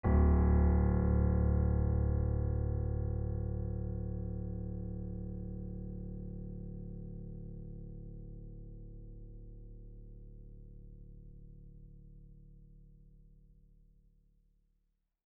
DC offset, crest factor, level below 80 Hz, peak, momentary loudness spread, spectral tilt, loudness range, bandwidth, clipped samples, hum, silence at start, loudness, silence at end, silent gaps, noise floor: under 0.1%; 18 dB; -38 dBFS; -16 dBFS; 26 LU; -9.5 dB/octave; 24 LU; 2.2 kHz; under 0.1%; none; 0.05 s; -35 LUFS; 2.2 s; none; -79 dBFS